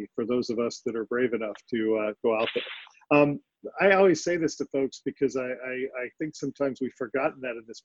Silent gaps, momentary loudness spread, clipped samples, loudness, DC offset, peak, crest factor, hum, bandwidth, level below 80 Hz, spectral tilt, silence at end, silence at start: none; 12 LU; under 0.1%; -27 LUFS; under 0.1%; -8 dBFS; 20 dB; none; 7.8 kHz; -68 dBFS; -5 dB/octave; 0.05 s; 0 s